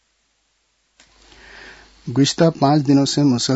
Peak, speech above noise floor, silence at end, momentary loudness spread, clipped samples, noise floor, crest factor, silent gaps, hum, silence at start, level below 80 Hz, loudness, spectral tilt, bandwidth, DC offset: -2 dBFS; 50 dB; 0 s; 15 LU; under 0.1%; -66 dBFS; 16 dB; none; none; 1.55 s; -56 dBFS; -16 LUFS; -5.5 dB/octave; 8 kHz; under 0.1%